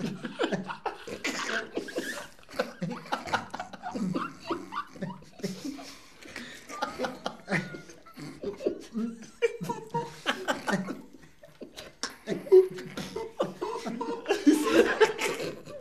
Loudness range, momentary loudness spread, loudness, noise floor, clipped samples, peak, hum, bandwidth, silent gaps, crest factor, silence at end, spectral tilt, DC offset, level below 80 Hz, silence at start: 10 LU; 18 LU; -31 LUFS; -54 dBFS; under 0.1%; -6 dBFS; none; 14 kHz; none; 26 dB; 0 s; -4.5 dB/octave; 0.2%; -64 dBFS; 0 s